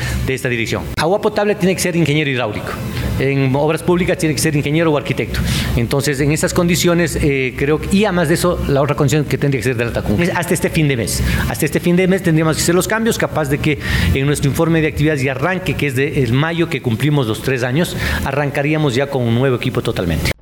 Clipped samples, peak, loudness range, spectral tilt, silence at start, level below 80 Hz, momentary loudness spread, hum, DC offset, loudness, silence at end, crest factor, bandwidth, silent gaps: under 0.1%; -4 dBFS; 2 LU; -5.5 dB/octave; 0 s; -30 dBFS; 4 LU; none; under 0.1%; -16 LUFS; 0.1 s; 12 dB; 19.5 kHz; none